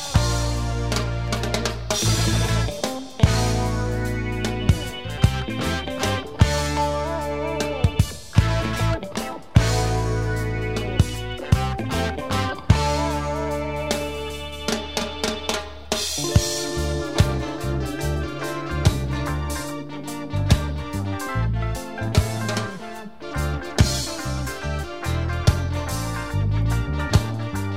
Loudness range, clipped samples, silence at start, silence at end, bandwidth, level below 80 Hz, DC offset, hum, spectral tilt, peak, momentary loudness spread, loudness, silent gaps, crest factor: 3 LU; under 0.1%; 0 s; 0 s; 16 kHz; -30 dBFS; 0.8%; none; -5 dB/octave; 0 dBFS; 8 LU; -24 LUFS; none; 22 dB